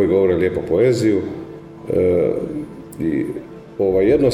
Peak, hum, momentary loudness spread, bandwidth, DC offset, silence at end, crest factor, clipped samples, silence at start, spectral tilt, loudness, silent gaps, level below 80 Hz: -4 dBFS; none; 17 LU; 13 kHz; under 0.1%; 0 s; 14 dB; under 0.1%; 0 s; -7.5 dB/octave; -18 LUFS; none; -44 dBFS